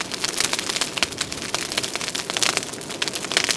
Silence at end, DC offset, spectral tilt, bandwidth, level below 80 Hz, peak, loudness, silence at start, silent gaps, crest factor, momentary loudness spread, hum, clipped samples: 0 s; under 0.1%; -0.5 dB/octave; 11 kHz; -54 dBFS; 0 dBFS; -23 LUFS; 0 s; none; 26 dB; 5 LU; none; under 0.1%